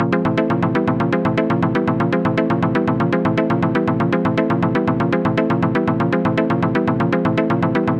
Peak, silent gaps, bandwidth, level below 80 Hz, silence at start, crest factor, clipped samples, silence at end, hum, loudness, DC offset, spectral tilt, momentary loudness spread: -4 dBFS; none; 7.6 kHz; -48 dBFS; 0 s; 14 dB; under 0.1%; 0 s; none; -18 LUFS; under 0.1%; -9 dB/octave; 0 LU